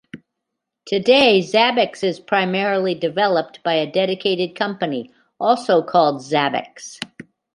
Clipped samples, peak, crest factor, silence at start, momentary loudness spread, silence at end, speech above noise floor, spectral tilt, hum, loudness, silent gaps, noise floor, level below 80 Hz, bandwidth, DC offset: under 0.1%; -2 dBFS; 18 dB; 0.15 s; 12 LU; 0.35 s; 62 dB; -4.5 dB/octave; none; -18 LUFS; none; -80 dBFS; -66 dBFS; 11.5 kHz; under 0.1%